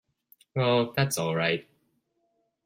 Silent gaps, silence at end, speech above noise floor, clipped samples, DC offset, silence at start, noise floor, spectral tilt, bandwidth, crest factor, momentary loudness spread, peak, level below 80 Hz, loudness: none; 1.05 s; 49 dB; under 0.1%; under 0.1%; 0.55 s; -74 dBFS; -4.5 dB/octave; 16 kHz; 20 dB; 7 LU; -10 dBFS; -68 dBFS; -27 LUFS